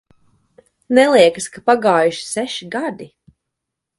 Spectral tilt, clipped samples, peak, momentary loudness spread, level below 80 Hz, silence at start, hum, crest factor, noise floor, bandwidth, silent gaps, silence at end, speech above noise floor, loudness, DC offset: -3.5 dB/octave; under 0.1%; 0 dBFS; 12 LU; -62 dBFS; 0.9 s; none; 18 dB; -80 dBFS; 11.5 kHz; none; 0.95 s; 65 dB; -16 LUFS; under 0.1%